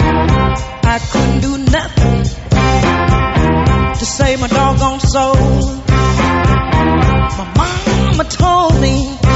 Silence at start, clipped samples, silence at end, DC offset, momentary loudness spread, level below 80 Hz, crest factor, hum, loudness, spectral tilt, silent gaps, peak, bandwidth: 0 s; under 0.1%; 0 s; under 0.1%; 4 LU; -18 dBFS; 12 dB; none; -13 LUFS; -6 dB/octave; none; 0 dBFS; 8.2 kHz